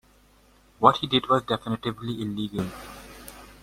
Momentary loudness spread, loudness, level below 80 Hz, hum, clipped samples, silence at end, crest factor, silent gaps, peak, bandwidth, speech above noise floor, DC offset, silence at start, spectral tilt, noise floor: 22 LU; -25 LUFS; -54 dBFS; none; under 0.1%; 0.15 s; 24 dB; none; -2 dBFS; 16.5 kHz; 33 dB; under 0.1%; 0.8 s; -6 dB/octave; -58 dBFS